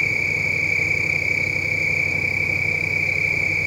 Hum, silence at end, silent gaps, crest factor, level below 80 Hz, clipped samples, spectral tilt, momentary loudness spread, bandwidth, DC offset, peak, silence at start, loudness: none; 0 s; none; 12 dB; -48 dBFS; under 0.1%; -4 dB/octave; 1 LU; 16 kHz; under 0.1%; -8 dBFS; 0 s; -19 LUFS